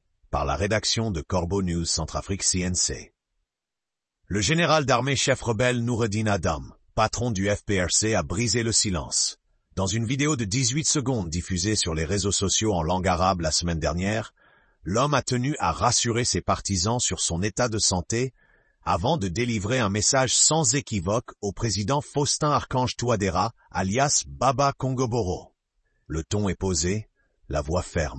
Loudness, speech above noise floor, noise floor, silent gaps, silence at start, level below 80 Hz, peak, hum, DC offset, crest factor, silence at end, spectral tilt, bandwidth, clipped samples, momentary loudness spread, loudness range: -24 LUFS; 63 dB; -88 dBFS; none; 0.3 s; -44 dBFS; -6 dBFS; none; under 0.1%; 20 dB; 0 s; -3.5 dB/octave; 8.8 kHz; under 0.1%; 8 LU; 3 LU